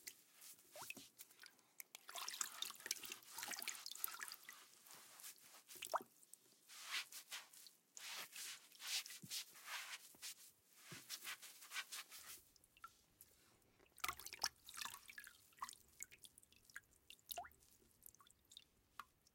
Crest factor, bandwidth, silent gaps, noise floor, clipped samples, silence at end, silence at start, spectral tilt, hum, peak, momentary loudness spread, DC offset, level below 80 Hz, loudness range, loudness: 34 dB; 17 kHz; none; -74 dBFS; under 0.1%; 0.05 s; 0 s; 1 dB/octave; none; -22 dBFS; 18 LU; under 0.1%; -86 dBFS; 7 LU; -51 LUFS